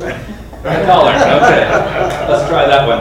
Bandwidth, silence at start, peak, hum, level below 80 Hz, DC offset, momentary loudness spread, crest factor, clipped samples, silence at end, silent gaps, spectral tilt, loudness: 15.5 kHz; 0 s; 0 dBFS; none; -32 dBFS; under 0.1%; 15 LU; 12 dB; 0.6%; 0 s; none; -5 dB/octave; -11 LUFS